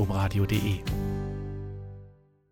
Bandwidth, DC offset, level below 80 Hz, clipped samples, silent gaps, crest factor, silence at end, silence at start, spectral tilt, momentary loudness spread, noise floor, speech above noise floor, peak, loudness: 17 kHz; under 0.1%; -40 dBFS; under 0.1%; none; 16 dB; 0.4 s; 0 s; -6.5 dB/octave; 16 LU; -54 dBFS; 27 dB; -14 dBFS; -30 LUFS